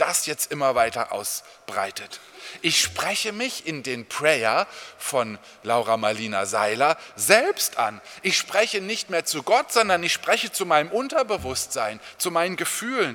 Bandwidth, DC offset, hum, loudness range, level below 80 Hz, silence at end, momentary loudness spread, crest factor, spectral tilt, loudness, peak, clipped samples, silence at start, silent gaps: 19 kHz; under 0.1%; none; 3 LU; -60 dBFS; 0 s; 10 LU; 24 dB; -2 dB/octave; -23 LUFS; 0 dBFS; under 0.1%; 0 s; none